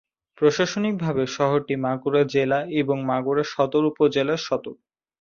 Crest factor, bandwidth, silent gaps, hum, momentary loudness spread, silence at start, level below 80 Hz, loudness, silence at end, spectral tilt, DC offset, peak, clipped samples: 16 dB; 7.2 kHz; none; none; 5 LU; 0.4 s; -62 dBFS; -23 LUFS; 0.5 s; -6 dB/octave; under 0.1%; -6 dBFS; under 0.1%